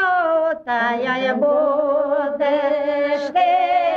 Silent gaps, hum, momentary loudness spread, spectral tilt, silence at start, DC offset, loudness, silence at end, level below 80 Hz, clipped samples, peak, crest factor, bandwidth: none; none; 3 LU; -5 dB/octave; 0 s; under 0.1%; -19 LUFS; 0 s; -64 dBFS; under 0.1%; -8 dBFS; 10 dB; 6.8 kHz